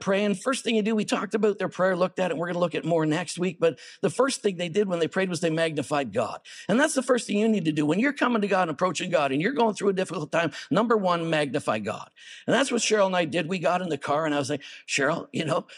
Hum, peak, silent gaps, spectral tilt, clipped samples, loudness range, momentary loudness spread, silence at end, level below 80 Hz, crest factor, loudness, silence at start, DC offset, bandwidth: none; -8 dBFS; none; -4.5 dB/octave; under 0.1%; 2 LU; 6 LU; 0 s; -78 dBFS; 18 dB; -25 LUFS; 0 s; under 0.1%; 12.5 kHz